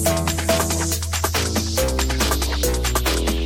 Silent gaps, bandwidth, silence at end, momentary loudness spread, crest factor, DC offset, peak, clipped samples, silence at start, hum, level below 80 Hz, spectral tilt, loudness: none; 17 kHz; 0 s; 2 LU; 14 dB; 0.1%; -6 dBFS; under 0.1%; 0 s; none; -26 dBFS; -3.5 dB/octave; -20 LUFS